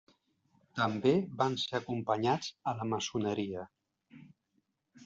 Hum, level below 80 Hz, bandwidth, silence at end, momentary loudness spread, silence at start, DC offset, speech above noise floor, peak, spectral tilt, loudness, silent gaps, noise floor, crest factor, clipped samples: none; -72 dBFS; 7.8 kHz; 0 s; 10 LU; 0.75 s; under 0.1%; 46 dB; -14 dBFS; -4.5 dB/octave; -33 LUFS; none; -79 dBFS; 20 dB; under 0.1%